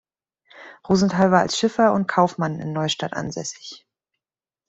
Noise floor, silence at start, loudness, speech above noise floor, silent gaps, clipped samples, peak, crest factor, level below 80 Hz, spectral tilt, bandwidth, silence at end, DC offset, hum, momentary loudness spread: under -90 dBFS; 0.55 s; -21 LUFS; over 69 dB; none; under 0.1%; -4 dBFS; 20 dB; -58 dBFS; -5 dB/octave; 8 kHz; 0.9 s; under 0.1%; none; 14 LU